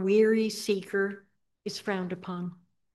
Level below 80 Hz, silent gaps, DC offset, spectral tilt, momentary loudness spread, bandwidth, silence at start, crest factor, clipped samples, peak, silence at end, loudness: -78 dBFS; none; under 0.1%; -5.5 dB/octave; 17 LU; 12.5 kHz; 0 s; 16 dB; under 0.1%; -12 dBFS; 0.4 s; -29 LUFS